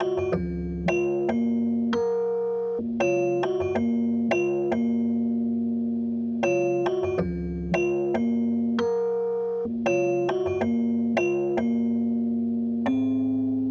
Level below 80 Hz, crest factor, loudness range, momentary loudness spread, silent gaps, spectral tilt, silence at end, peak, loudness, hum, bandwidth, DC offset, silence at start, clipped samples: -48 dBFS; 14 dB; 1 LU; 3 LU; none; -7.5 dB/octave; 0 s; -10 dBFS; -25 LUFS; none; 6.8 kHz; under 0.1%; 0 s; under 0.1%